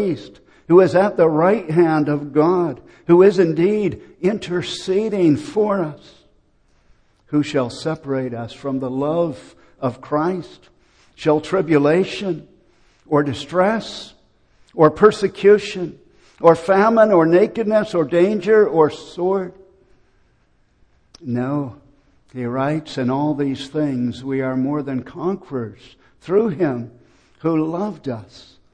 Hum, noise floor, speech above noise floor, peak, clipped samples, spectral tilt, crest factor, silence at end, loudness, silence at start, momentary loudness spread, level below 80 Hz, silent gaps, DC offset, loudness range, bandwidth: none; -59 dBFS; 41 dB; 0 dBFS; under 0.1%; -7 dB/octave; 18 dB; 0.5 s; -18 LUFS; 0 s; 15 LU; -56 dBFS; none; under 0.1%; 9 LU; 9.8 kHz